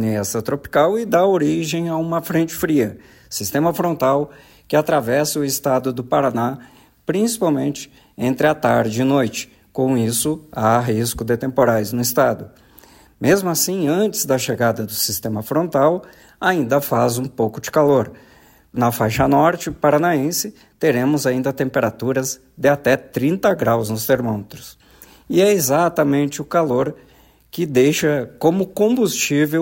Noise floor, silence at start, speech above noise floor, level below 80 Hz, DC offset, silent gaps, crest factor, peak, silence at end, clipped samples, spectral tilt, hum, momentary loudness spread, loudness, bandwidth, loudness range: -48 dBFS; 0 s; 30 dB; -50 dBFS; under 0.1%; none; 16 dB; -4 dBFS; 0 s; under 0.1%; -5 dB/octave; none; 8 LU; -18 LUFS; 16.5 kHz; 2 LU